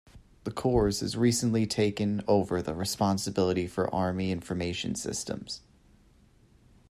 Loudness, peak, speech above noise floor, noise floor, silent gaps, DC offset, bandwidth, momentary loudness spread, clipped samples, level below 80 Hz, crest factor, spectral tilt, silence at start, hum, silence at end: -29 LUFS; -12 dBFS; 32 dB; -60 dBFS; none; under 0.1%; 14 kHz; 9 LU; under 0.1%; -50 dBFS; 18 dB; -5 dB/octave; 0.15 s; none; 1.3 s